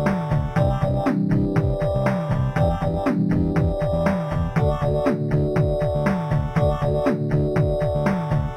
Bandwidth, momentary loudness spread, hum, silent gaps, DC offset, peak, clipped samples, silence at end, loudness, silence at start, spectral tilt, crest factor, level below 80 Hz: 10 kHz; 2 LU; none; none; under 0.1%; -6 dBFS; under 0.1%; 0 s; -22 LUFS; 0 s; -9 dB/octave; 14 dB; -32 dBFS